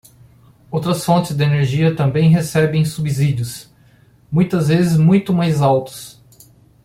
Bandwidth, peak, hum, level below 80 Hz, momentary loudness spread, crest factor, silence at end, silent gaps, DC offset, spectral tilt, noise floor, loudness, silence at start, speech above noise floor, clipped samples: 15.5 kHz; -2 dBFS; none; -48 dBFS; 12 LU; 14 dB; 0.75 s; none; under 0.1%; -7 dB/octave; -50 dBFS; -16 LUFS; 0.7 s; 35 dB; under 0.1%